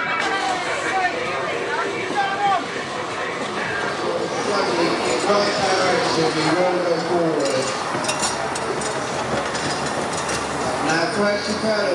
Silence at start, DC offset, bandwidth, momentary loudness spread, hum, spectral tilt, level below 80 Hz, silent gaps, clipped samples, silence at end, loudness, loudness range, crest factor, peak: 0 s; under 0.1%; 11.5 kHz; 5 LU; none; -3.5 dB/octave; -54 dBFS; none; under 0.1%; 0 s; -21 LUFS; 3 LU; 16 dB; -4 dBFS